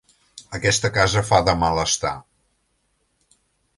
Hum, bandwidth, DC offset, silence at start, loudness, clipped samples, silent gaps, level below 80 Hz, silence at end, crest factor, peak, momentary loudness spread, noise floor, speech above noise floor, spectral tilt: none; 11.5 kHz; under 0.1%; 0.35 s; -19 LUFS; under 0.1%; none; -40 dBFS; 1.6 s; 22 dB; -2 dBFS; 11 LU; -69 dBFS; 49 dB; -3.5 dB/octave